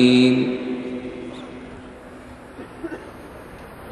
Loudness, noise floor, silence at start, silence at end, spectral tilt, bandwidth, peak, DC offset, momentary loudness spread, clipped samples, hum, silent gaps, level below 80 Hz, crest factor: -22 LUFS; -40 dBFS; 0 s; 0 s; -6 dB/octave; 10.5 kHz; -4 dBFS; under 0.1%; 23 LU; under 0.1%; none; none; -52 dBFS; 20 dB